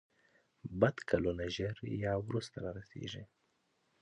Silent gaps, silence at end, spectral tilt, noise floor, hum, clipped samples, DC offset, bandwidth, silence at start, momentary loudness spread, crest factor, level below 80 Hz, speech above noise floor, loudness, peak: none; 0.75 s; -6.5 dB/octave; -78 dBFS; none; under 0.1%; under 0.1%; 10 kHz; 0.65 s; 13 LU; 24 dB; -58 dBFS; 42 dB; -37 LUFS; -14 dBFS